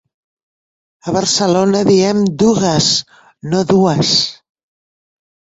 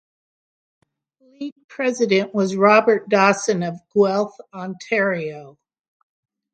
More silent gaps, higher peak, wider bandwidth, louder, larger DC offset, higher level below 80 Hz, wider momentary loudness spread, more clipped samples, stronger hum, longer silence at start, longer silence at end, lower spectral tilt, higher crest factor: second, none vs 1.52-1.56 s, 1.64-1.69 s; about the same, 0 dBFS vs 0 dBFS; second, 8.2 kHz vs 9.2 kHz; first, -13 LUFS vs -19 LUFS; neither; first, -50 dBFS vs -70 dBFS; second, 8 LU vs 19 LU; neither; neither; second, 1.05 s vs 1.4 s; first, 1.25 s vs 1.05 s; about the same, -4.5 dB/octave vs -5 dB/octave; second, 14 dB vs 20 dB